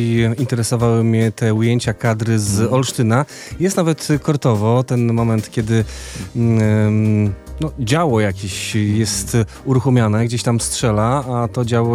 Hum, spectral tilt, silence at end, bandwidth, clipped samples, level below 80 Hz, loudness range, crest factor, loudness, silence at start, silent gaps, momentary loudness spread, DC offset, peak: none; -6 dB/octave; 0 s; 14.5 kHz; under 0.1%; -40 dBFS; 1 LU; 14 dB; -17 LUFS; 0 s; none; 6 LU; under 0.1%; -2 dBFS